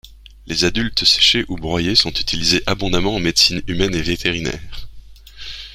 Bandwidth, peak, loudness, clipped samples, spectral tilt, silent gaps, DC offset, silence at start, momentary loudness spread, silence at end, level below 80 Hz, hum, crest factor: 16 kHz; 0 dBFS; -16 LUFS; under 0.1%; -3 dB/octave; none; under 0.1%; 0.05 s; 19 LU; 0 s; -34 dBFS; none; 18 dB